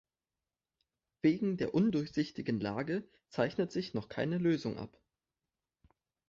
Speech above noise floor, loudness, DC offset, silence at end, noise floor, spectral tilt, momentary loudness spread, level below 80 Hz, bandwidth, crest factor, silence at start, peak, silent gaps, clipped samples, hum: over 56 dB; -34 LUFS; under 0.1%; 1.4 s; under -90 dBFS; -7.5 dB/octave; 9 LU; -68 dBFS; 7.4 kHz; 18 dB; 1.25 s; -18 dBFS; none; under 0.1%; none